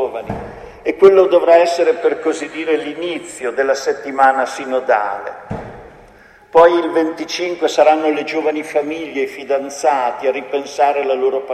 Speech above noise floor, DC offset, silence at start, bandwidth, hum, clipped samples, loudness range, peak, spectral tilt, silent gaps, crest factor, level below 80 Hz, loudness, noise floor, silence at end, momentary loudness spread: 29 dB; under 0.1%; 0 s; 12.5 kHz; none; under 0.1%; 4 LU; 0 dBFS; -4 dB/octave; none; 16 dB; -50 dBFS; -16 LUFS; -44 dBFS; 0 s; 14 LU